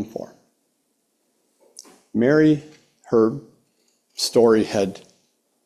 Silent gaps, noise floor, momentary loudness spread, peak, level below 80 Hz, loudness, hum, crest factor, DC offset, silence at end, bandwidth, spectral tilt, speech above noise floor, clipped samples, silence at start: none; -70 dBFS; 20 LU; -4 dBFS; -62 dBFS; -20 LUFS; none; 18 dB; under 0.1%; 0.65 s; 14.5 kHz; -5.5 dB/octave; 52 dB; under 0.1%; 0 s